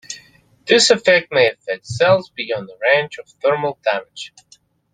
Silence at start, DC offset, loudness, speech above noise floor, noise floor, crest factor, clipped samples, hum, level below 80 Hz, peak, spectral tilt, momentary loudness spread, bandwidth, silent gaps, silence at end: 0.1 s; under 0.1%; -17 LUFS; 33 dB; -50 dBFS; 18 dB; under 0.1%; none; -60 dBFS; -2 dBFS; -2.5 dB/octave; 21 LU; 9.6 kHz; none; 0.65 s